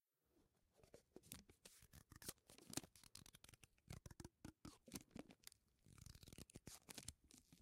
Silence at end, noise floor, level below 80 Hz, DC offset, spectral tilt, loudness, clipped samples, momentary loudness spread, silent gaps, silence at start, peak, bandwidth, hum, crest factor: 0 s; -83 dBFS; -74 dBFS; under 0.1%; -3 dB/octave; -60 LUFS; under 0.1%; 13 LU; none; 0.35 s; -28 dBFS; 16 kHz; none; 34 dB